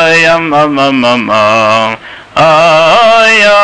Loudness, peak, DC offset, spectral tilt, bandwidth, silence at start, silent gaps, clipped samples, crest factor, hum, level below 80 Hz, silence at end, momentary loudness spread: -6 LUFS; 0 dBFS; under 0.1%; -4 dB/octave; 10.5 kHz; 0 s; none; under 0.1%; 6 dB; none; -44 dBFS; 0 s; 6 LU